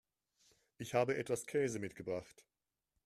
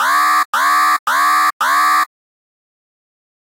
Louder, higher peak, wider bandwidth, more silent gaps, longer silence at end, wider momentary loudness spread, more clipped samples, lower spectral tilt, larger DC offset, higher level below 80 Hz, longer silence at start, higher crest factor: second, -39 LUFS vs -13 LUFS; second, -20 dBFS vs -4 dBFS; second, 14.5 kHz vs 16 kHz; second, none vs 0.45-0.53 s, 0.99-1.06 s, 1.53-1.60 s; second, 0.75 s vs 1.35 s; first, 9 LU vs 2 LU; neither; first, -5 dB/octave vs 2.5 dB/octave; neither; first, -76 dBFS vs -88 dBFS; first, 0.8 s vs 0 s; first, 22 dB vs 12 dB